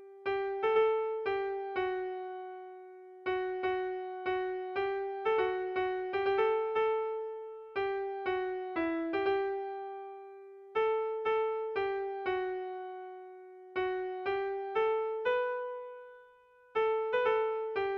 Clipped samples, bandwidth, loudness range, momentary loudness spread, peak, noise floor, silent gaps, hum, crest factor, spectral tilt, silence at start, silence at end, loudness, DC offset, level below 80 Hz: under 0.1%; 5.6 kHz; 4 LU; 15 LU; -18 dBFS; -61 dBFS; none; none; 16 dB; -6.5 dB/octave; 0 s; 0 s; -34 LUFS; under 0.1%; -70 dBFS